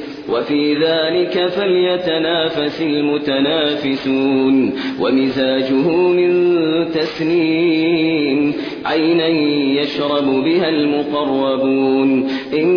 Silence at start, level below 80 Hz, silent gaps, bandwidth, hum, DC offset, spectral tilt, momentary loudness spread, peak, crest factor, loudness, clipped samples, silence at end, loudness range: 0 s; -54 dBFS; none; 5.4 kHz; none; under 0.1%; -7 dB/octave; 4 LU; -4 dBFS; 12 dB; -16 LUFS; under 0.1%; 0 s; 1 LU